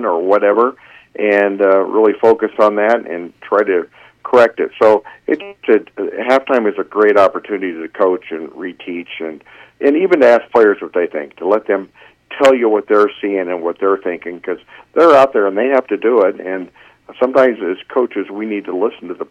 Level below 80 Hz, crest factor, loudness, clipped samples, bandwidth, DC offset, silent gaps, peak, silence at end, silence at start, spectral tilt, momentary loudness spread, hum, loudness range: -62 dBFS; 14 dB; -14 LUFS; under 0.1%; 8.8 kHz; under 0.1%; none; 0 dBFS; 0.05 s; 0 s; -5.5 dB/octave; 15 LU; none; 3 LU